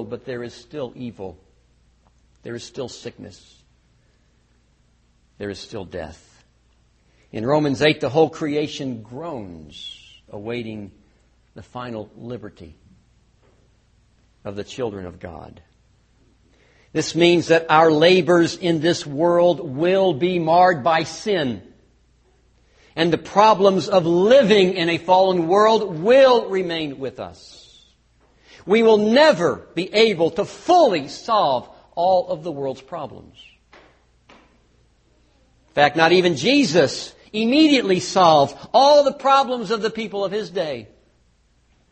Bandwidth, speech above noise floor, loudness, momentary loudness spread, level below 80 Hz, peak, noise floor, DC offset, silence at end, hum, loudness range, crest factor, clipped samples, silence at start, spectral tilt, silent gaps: 8.8 kHz; 41 dB; -18 LUFS; 20 LU; -56 dBFS; 0 dBFS; -60 dBFS; under 0.1%; 1.05 s; none; 21 LU; 20 dB; under 0.1%; 0 s; -5 dB/octave; none